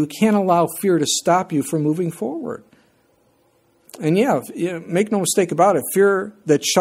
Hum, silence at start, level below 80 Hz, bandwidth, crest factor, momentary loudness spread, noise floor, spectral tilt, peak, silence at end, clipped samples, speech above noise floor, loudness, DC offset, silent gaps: none; 0 s; -66 dBFS; 16.5 kHz; 18 dB; 9 LU; -60 dBFS; -4.5 dB/octave; -2 dBFS; 0 s; under 0.1%; 42 dB; -19 LUFS; under 0.1%; none